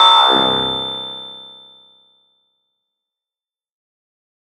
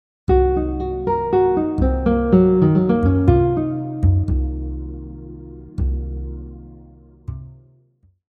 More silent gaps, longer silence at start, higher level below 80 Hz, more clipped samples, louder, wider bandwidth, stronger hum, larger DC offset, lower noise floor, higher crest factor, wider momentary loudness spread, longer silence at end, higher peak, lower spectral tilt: neither; second, 0 s vs 0.3 s; second, -56 dBFS vs -26 dBFS; neither; first, -14 LUFS vs -18 LUFS; first, 11.5 kHz vs 4.5 kHz; neither; neither; first, under -90 dBFS vs -58 dBFS; about the same, 18 dB vs 18 dB; first, 24 LU vs 20 LU; first, 3.1 s vs 0.75 s; about the same, 0 dBFS vs 0 dBFS; second, -3 dB/octave vs -11.5 dB/octave